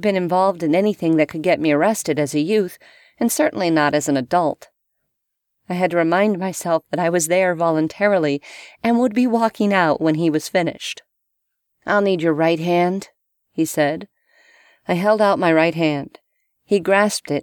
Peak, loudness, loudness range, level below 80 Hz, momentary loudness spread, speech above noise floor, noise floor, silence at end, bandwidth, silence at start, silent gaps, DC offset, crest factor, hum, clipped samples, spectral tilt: -2 dBFS; -19 LUFS; 2 LU; -64 dBFS; 10 LU; 58 dB; -76 dBFS; 0 s; 19 kHz; 0 s; none; under 0.1%; 18 dB; none; under 0.1%; -5 dB/octave